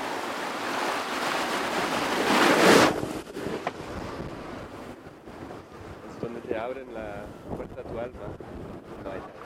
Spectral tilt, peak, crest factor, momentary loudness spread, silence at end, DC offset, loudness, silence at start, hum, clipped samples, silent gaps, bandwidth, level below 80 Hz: -3.5 dB/octave; -4 dBFS; 24 dB; 22 LU; 0 s; under 0.1%; -26 LUFS; 0 s; none; under 0.1%; none; 16.5 kHz; -54 dBFS